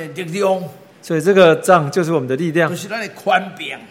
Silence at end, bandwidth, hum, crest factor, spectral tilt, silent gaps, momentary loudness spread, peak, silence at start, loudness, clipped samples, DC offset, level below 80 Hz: 0.05 s; 16.5 kHz; none; 16 dB; -5.5 dB/octave; none; 14 LU; 0 dBFS; 0 s; -16 LUFS; under 0.1%; under 0.1%; -64 dBFS